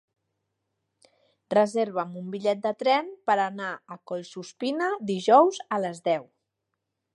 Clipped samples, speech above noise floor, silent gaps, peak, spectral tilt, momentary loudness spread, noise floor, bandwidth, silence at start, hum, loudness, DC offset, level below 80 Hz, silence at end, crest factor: under 0.1%; 57 dB; none; -6 dBFS; -5 dB/octave; 16 LU; -82 dBFS; 11 kHz; 1.5 s; none; -26 LUFS; under 0.1%; -80 dBFS; 0.9 s; 20 dB